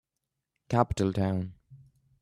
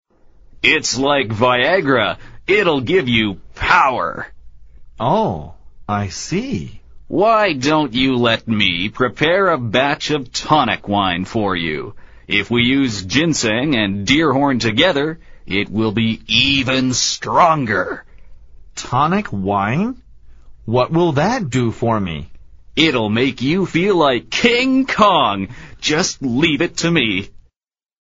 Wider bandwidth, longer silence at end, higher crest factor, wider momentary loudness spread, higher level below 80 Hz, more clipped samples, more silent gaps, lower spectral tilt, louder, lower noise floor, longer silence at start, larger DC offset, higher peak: first, 12 kHz vs 8 kHz; second, 0.45 s vs 0.65 s; first, 24 dB vs 18 dB; about the same, 8 LU vs 10 LU; second, -52 dBFS vs -42 dBFS; neither; neither; first, -7.5 dB/octave vs -3 dB/octave; second, -29 LUFS vs -16 LUFS; first, -85 dBFS vs -81 dBFS; about the same, 0.7 s vs 0.6 s; neither; second, -8 dBFS vs 0 dBFS